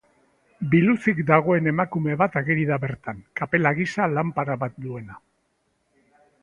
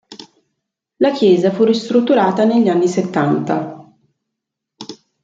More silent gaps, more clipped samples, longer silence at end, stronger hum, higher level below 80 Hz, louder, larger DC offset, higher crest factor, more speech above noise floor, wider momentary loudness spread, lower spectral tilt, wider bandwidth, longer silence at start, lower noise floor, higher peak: neither; neither; first, 1.25 s vs 0.3 s; neither; first, -58 dBFS vs -64 dBFS; second, -22 LUFS vs -15 LUFS; neither; first, 22 dB vs 14 dB; second, 48 dB vs 66 dB; second, 15 LU vs 20 LU; first, -8.5 dB/octave vs -6.5 dB/octave; first, 9.4 kHz vs 7.8 kHz; first, 0.6 s vs 0.1 s; second, -70 dBFS vs -80 dBFS; about the same, 0 dBFS vs -2 dBFS